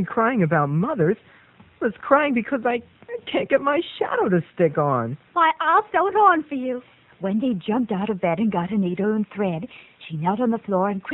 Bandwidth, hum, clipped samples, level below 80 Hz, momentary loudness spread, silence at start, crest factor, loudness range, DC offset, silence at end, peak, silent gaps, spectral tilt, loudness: 4.1 kHz; none; under 0.1%; -62 dBFS; 10 LU; 0 s; 20 dB; 4 LU; under 0.1%; 0 s; -2 dBFS; none; -9.5 dB/octave; -22 LUFS